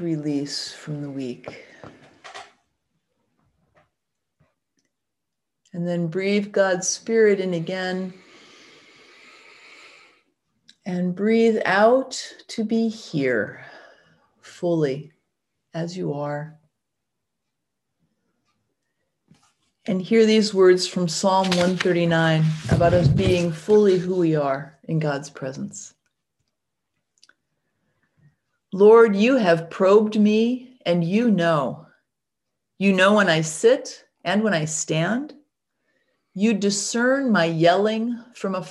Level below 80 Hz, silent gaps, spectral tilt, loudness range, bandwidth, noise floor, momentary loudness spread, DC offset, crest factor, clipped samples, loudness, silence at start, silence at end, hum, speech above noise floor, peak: -52 dBFS; none; -5.5 dB/octave; 16 LU; 12 kHz; -83 dBFS; 16 LU; under 0.1%; 18 dB; under 0.1%; -21 LUFS; 0 s; 0 s; none; 63 dB; -4 dBFS